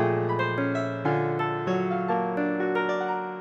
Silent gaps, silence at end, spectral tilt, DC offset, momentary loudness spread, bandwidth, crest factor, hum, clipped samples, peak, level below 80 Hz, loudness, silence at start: none; 0 s; -8 dB/octave; under 0.1%; 2 LU; 7.6 kHz; 16 dB; none; under 0.1%; -10 dBFS; -70 dBFS; -27 LUFS; 0 s